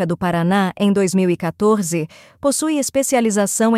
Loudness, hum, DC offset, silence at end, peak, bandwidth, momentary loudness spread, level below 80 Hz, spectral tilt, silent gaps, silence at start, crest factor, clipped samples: -18 LUFS; none; under 0.1%; 0 s; -4 dBFS; 16 kHz; 5 LU; -54 dBFS; -5 dB/octave; none; 0 s; 14 dB; under 0.1%